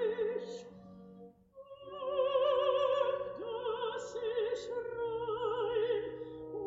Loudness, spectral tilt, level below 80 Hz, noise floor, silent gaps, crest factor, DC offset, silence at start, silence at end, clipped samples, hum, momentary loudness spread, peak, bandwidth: -35 LUFS; -2.5 dB/octave; -70 dBFS; -55 dBFS; none; 16 dB; under 0.1%; 0 s; 0 s; under 0.1%; none; 21 LU; -20 dBFS; 7.6 kHz